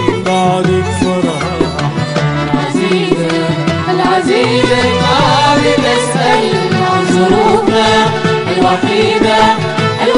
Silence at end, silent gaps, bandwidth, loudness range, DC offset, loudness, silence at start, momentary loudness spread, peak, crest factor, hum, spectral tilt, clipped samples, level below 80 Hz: 0 s; none; 11 kHz; 3 LU; under 0.1%; -11 LUFS; 0 s; 5 LU; 0 dBFS; 10 dB; none; -5 dB/octave; under 0.1%; -38 dBFS